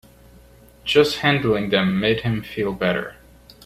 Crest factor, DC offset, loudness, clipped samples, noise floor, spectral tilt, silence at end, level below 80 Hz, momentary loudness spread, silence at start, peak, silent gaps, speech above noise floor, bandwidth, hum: 20 dB; under 0.1%; -20 LUFS; under 0.1%; -48 dBFS; -6 dB/octave; 0.55 s; -48 dBFS; 9 LU; 0.85 s; -2 dBFS; none; 29 dB; 15 kHz; none